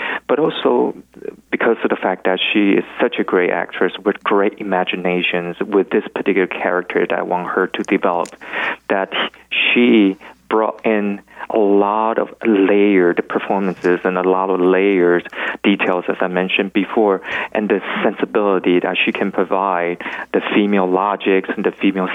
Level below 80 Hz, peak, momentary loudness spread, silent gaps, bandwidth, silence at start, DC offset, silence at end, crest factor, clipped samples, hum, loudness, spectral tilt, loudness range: -62 dBFS; -4 dBFS; 7 LU; none; 9.4 kHz; 0 s; under 0.1%; 0 s; 12 dB; under 0.1%; none; -17 LUFS; -6.5 dB/octave; 2 LU